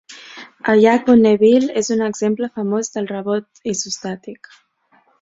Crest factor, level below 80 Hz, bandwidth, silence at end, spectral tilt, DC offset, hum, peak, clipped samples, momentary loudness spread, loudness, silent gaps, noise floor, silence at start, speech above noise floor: 16 dB; -58 dBFS; 7.8 kHz; 0.85 s; -4.5 dB/octave; under 0.1%; none; -2 dBFS; under 0.1%; 19 LU; -17 LUFS; none; -58 dBFS; 0.1 s; 42 dB